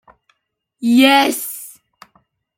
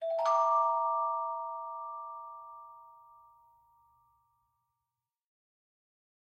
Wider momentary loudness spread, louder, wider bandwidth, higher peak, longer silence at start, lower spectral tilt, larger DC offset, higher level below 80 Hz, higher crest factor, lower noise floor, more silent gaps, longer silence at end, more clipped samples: about the same, 20 LU vs 22 LU; first, -14 LUFS vs -31 LUFS; first, 17 kHz vs 8 kHz; first, -2 dBFS vs -18 dBFS; first, 0.8 s vs 0 s; first, -2.5 dB/octave vs -0.5 dB/octave; neither; first, -68 dBFS vs -88 dBFS; about the same, 18 dB vs 18 dB; second, -71 dBFS vs -90 dBFS; neither; second, 0.85 s vs 3.3 s; neither